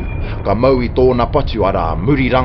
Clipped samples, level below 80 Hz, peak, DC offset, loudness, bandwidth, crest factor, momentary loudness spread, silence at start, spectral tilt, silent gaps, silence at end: under 0.1%; -24 dBFS; 0 dBFS; under 0.1%; -15 LUFS; 5.8 kHz; 14 dB; 6 LU; 0 s; -10 dB/octave; none; 0 s